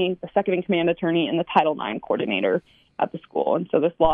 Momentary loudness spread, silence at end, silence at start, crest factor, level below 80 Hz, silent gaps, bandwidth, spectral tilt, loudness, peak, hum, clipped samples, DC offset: 7 LU; 0 s; 0 s; 18 dB; -48 dBFS; none; 4.8 kHz; -8.5 dB/octave; -23 LUFS; -4 dBFS; none; under 0.1%; under 0.1%